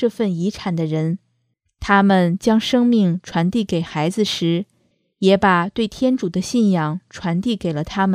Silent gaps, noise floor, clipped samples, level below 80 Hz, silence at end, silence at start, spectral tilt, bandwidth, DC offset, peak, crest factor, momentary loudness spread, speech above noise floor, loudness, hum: none; -69 dBFS; under 0.1%; -48 dBFS; 0 s; 0 s; -6 dB/octave; 14 kHz; under 0.1%; -2 dBFS; 18 dB; 9 LU; 51 dB; -19 LUFS; none